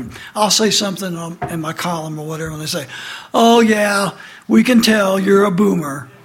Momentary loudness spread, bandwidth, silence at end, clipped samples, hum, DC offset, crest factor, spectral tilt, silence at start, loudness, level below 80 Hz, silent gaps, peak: 14 LU; 16.5 kHz; 0.2 s; under 0.1%; none; under 0.1%; 14 dB; -4 dB/octave; 0 s; -15 LUFS; -52 dBFS; none; -2 dBFS